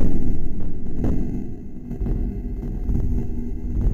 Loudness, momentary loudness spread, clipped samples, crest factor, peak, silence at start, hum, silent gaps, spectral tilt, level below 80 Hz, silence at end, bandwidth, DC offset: -28 LUFS; 7 LU; under 0.1%; 12 dB; -6 dBFS; 0 s; none; none; -10.5 dB/octave; -24 dBFS; 0 s; 2.1 kHz; under 0.1%